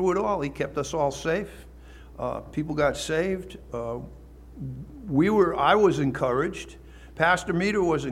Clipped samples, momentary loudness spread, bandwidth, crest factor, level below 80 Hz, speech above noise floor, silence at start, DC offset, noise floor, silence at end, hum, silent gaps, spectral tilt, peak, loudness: under 0.1%; 18 LU; 14.5 kHz; 18 dB; -46 dBFS; 21 dB; 0 s; under 0.1%; -46 dBFS; 0 s; none; none; -5.5 dB/octave; -8 dBFS; -25 LUFS